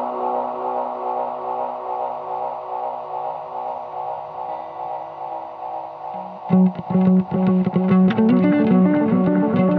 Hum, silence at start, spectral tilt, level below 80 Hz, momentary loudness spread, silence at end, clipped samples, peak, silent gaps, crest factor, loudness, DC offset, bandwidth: none; 0 s; -11.5 dB/octave; -60 dBFS; 15 LU; 0 s; under 0.1%; -4 dBFS; none; 16 dB; -21 LUFS; under 0.1%; 4.3 kHz